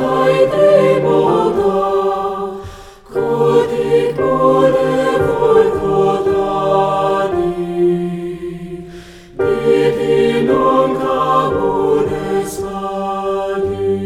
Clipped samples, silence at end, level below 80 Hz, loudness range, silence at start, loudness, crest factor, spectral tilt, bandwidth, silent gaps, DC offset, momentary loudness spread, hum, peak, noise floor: under 0.1%; 0 s; -42 dBFS; 4 LU; 0 s; -15 LUFS; 14 dB; -6.5 dB/octave; 14 kHz; none; under 0.1%; 11 LU; none; 0 dBFS; -35 dBFS